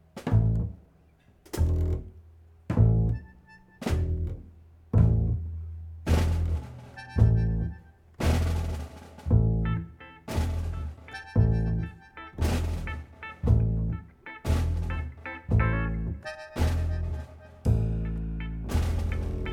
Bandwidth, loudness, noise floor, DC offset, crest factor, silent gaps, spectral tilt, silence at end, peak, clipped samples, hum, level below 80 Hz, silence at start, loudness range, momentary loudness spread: 15 kHz; -29 LUFS; -59 dBFS; under 0.1%; 20 dB; none; -7.5 dB/octave; 0 s; -8 dBFS; under 0.1%; none; -34 dBFS; 0.15 s; 3 LU; 15 LU